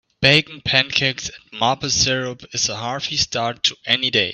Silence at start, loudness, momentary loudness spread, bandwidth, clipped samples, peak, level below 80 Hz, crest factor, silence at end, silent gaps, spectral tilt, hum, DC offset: 0.2 s; -18 LUFS; 10 LU; 10.5 kHz; under 0.1%; 0 dBFS; -48 dBFS; 20 dB; 0 s; none; -2.5 dB/octave; none; under 0.1%